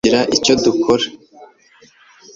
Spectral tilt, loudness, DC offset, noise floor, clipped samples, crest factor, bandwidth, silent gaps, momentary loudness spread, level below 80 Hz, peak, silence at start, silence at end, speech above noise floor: -3.5 dB/octave; -15 LUFS; under 0.1%; -50 dBFS; under 0.1%; 16 dB; 7.8 kHz; none; 4 LU; -48 dBFS; 0 dBFS; 0.05 s; 0.9 s; 35 dB